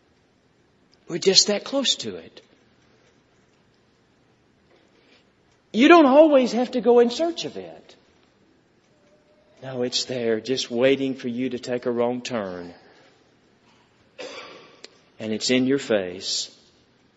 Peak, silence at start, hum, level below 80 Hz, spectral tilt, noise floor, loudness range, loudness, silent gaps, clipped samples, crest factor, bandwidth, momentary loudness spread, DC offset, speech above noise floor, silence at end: 0 dBFS; 1.1 s; none; -70 dBFS; -3.5 dB/octave; -62 dBFS; 12 LU; -21 LUFS; none; under 0.1%; 24 dB; 8 kHz; 23 LU; under 0.1%; 41 dB; 0.7 s